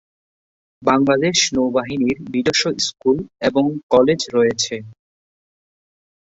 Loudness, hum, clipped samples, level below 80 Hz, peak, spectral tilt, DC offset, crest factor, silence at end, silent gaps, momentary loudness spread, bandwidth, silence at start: -18 LUFS; none; under 0.1%; -54 dBFS; -2 dBFS; -3.5 dB/octave; under 0.1%; 18 dB; 1.35 s; 3.83-3.89 s; 6 LU; 8 kHz; 0.8 s